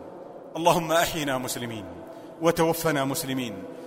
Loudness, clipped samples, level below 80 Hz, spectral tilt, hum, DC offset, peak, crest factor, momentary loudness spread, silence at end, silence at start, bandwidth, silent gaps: -26 LUFS; under 0.1%; -54 dBFS; -4 dB/octave; none; under 0.1%; -6 dBFS; 20 dB; 18 LU; 0 s; 0 s; 16 kHz; none